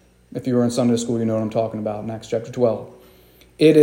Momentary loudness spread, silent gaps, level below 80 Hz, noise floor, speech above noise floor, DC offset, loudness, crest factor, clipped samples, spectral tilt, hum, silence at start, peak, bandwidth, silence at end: 12 LU; none; -58 dBFS; -51 dBFS; 29 dB; under 0.1%; -21 LUFS; 18 dB; under 0.1%; -6.5 dB/octave; none; 0.3 s; -2 dBFS; 16.5 kHz; 0 s